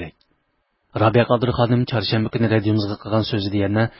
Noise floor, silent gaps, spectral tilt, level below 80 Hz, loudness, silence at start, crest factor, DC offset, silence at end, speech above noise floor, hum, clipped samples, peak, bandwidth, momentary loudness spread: -69 dBFS; none; -11 dB/octave; -44 dBFS; -20 LUFS; 0 s; 18 dB; under 0.1%; 0.1 s; 50 dB; none; under 0.1%; -2 dBFS; 5.8 kHz; 5 LU